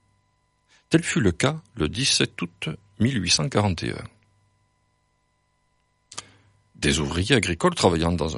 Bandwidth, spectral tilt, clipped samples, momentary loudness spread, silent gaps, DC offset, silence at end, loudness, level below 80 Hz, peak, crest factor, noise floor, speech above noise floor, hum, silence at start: 11.5 kHz; -4 dB/octave; under 0.1%; 16 LU; none; under 0.1%; 0 s; -23 LUFS; -44 dBFS; -4 dBFS; 22 dB; -69 dBFS; 46 dB; 50 Hz at -50 dBFS; 0.9 s